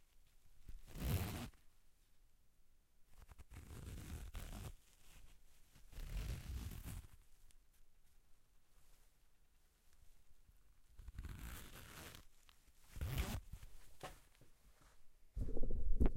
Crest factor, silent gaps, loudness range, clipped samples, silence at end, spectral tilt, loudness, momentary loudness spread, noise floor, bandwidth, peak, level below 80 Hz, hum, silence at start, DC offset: 24 dB; none; 8 LU; under 0.1%; 0 s; -5.5 dB/octave; -50 LUFS; 22 LU; -71 dBFS; 16.5 kHz; -22 dBFS; -48 dBFS; none; 0.45 s; under 0.1%